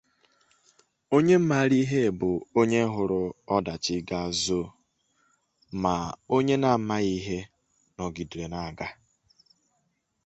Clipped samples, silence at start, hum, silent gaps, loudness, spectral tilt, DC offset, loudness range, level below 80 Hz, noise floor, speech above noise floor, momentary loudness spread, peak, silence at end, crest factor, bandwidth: under 0.1%; 1.1 s; none; none; -26 LUFS; -5.5 dB/octave; under 0.1%; 6 LU; -54 dBFS; -75 dBFS; 49 dB; 14 LU; -8 dBFS; 1.35 s; 20 dB; 8.4 kHz